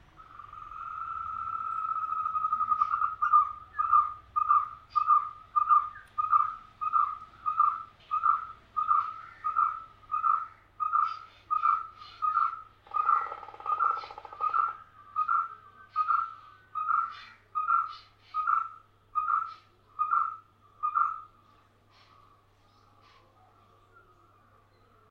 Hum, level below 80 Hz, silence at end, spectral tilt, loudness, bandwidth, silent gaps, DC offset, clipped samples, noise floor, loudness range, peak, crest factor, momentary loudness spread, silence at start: none; -66 dBFS; 3.85 s; -4 dB/octave; -29 LUFS; 5.8 kHz; none; under 0.1%; under 0.1%; -63 dBFS; 6 LU; -12 dBFS; 20 dB; 15 LU; 0.2 s